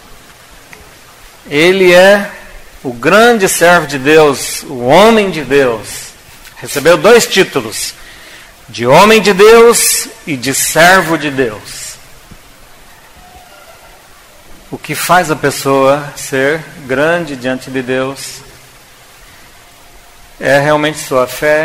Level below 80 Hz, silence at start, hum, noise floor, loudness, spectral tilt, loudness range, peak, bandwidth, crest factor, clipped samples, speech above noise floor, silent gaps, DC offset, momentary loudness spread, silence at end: -42 dBFS; 1.45 s; none; -39 dBFS; -9 LUFS; -3.5 dB/octave; 10 LU; 0 dBFS; 16.5 kHz; 12 dB; 0.6%; 30 dB; none; 0.3%; 19 LU; 0 s